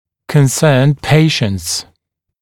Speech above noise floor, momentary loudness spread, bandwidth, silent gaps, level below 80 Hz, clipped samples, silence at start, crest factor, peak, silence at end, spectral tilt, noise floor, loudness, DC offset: 57 dB; 8 LU; 16.5 kHz; none; -44 dBFS; under 0.1%; 0.3 s; 14 dB; 0 dBFS; 0.6 s; -5 dB/octave; -68 dBFS; -13 LUFS; under 0.1%